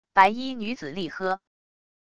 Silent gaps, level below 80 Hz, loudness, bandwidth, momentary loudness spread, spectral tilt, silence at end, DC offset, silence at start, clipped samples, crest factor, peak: none; -62 dBFS; -26 LUFS; 11 kHz; 13 LU; -5 dB/octave; 0.65 s; under 0.1%; 0.05 s; under 0.1%; 24 dB; -4 dBFS